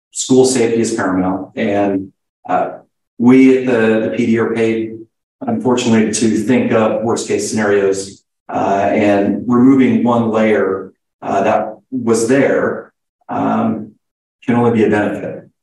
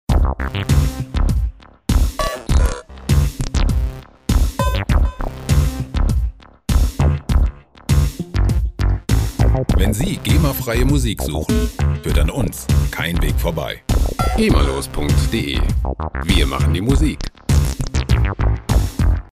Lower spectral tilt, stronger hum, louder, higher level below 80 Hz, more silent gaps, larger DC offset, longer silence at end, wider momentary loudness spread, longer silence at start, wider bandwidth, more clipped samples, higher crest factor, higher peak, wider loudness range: about the same, -5.5 dB/octave vs -6 dB/octave; neither; first, -14 LUFS vs -19 LUFS; second, -58 dBFS vs -20 dBFS; first, 2.29-2.43 s, 3.07-3.17 s, 5.23-5.39 s, 8.40-8.46 s, 11.13-11.19 s, 13.09-13.19 s, 14.11-14.39 s vs none; neither; about the same, 0.2 s vs 0.1 s; first, 13 LU vs 6 LU; about the same, 0.15 s vs 0.1 s; second, 12 kHz vs 16 kHz; neither; about the same, 14 dB vs 16 dB; about the same, 0 dBFS vs -2 dBFS; about the same, 3 LU vs 2 LU